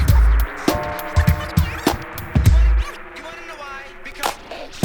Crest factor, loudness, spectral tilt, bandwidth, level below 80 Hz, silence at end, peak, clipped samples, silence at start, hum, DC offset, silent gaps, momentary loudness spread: 16 dB; -20 LUFS; -6 dB/octave; over 20 kHz; -20 dBFS; 0 s; -2 dBFS; under 0.1%; 0 s; none; under 0.1%; none; 17 LU